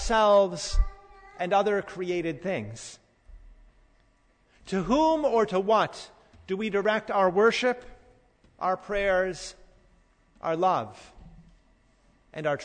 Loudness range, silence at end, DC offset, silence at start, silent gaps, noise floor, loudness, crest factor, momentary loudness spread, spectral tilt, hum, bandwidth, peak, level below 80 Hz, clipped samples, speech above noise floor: 7 LU; 0 s; under 0.1%; 0 s; none; -64 dBFS; -26 LUFS; 16 dB; 17 LU; -5 dB/octave; none; 9.6 kHz; -10 dBFS; -40 dBFS; under 0.1%; 39 dB